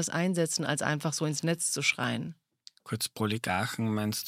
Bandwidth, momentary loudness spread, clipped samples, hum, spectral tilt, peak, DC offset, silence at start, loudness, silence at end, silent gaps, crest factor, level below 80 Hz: 16.5 kHz; 7 LU; under 0.1%; none; -4 dB/octave; -10 dBFS; under 0.1%; 0 s; -30 LUFS; 0 s; none; 20 dB; -70 dBFS